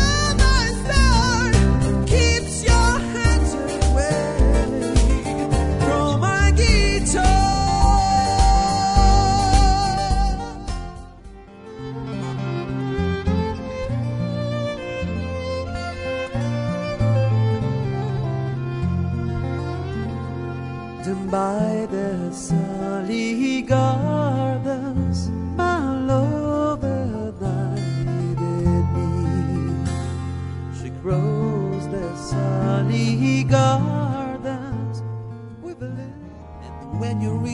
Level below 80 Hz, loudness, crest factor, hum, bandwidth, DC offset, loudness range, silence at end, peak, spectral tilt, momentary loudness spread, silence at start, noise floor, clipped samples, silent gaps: -26 dBFS; -21 LUFS; 18 dB; none; 11 kHz; under 0.1%; 8 LU; 0 s; -2 dBFS; -5.5 dB/octave; 12 LU; 0 s; -40 dBFS; under 0.1%; none